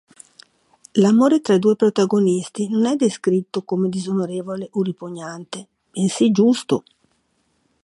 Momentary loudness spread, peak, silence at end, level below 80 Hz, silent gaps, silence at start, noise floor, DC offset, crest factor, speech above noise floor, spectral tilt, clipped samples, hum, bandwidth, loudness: 16 LU; -4 dBFS; 1.05 s; -68 dBFS; none; 0.95 s; -66 dBFS; under 0.1%; 16 dB; 48 dB; -6 dB/octave; under 0.1%; none; 11.5 kHz; -19 LUFS